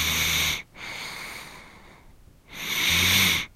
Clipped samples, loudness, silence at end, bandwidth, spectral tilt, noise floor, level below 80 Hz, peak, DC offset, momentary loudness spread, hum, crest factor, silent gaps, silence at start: under 0.1%; -22 LUFS; 0.1 s; 16 kHz; -1 dB/octave; -52 dBFS; -46 dBFS; -8 dBFS; under 0.1%; 20 LU; none; 20 dB; none; 0 s